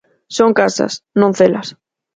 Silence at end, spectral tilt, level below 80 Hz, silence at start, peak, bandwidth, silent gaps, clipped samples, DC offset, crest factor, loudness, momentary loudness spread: 0.45 s; -5 dB/octave; -58 dBFS; 0.3 s; 0 dBFS; 9.4 kHz; none; under 0.1%; under 0.1%; 16 dB; -14 LUFS; 12 LU